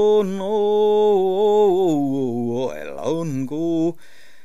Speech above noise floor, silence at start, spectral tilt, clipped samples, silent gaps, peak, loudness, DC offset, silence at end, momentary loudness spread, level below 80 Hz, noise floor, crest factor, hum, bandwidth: 34 dB; 0 s; -7 dB/octave; under 0.1%; none; -6 dBFS; -20 LUFS; 2%; 0.5 s; 9 LU; -66 dBFS; -51 dBFS; 12 dB; none; 12.5 kHz